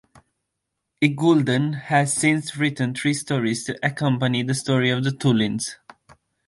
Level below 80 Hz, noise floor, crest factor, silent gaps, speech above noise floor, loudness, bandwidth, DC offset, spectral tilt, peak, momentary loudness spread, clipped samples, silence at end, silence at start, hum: -62 dBFS; -80 dBFS; 18 dB; none; 59 dB; -22 LUFS; 11.5 kHz; under 0.1%; -5 dB/octave; -4 dBFS; 6 LU; under 0.1%; 0.75 s; 1 s; none